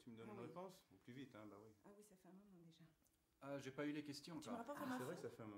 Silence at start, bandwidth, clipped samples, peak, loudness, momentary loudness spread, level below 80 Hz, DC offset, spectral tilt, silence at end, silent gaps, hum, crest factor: 0 s; 16 kHz; under 0.1%; -34 dBFS; -54 LUFS; 18 LU; -90 dBFS; under 0.1%; -5.5 dB/octave; 0 s; none; none; 20 dB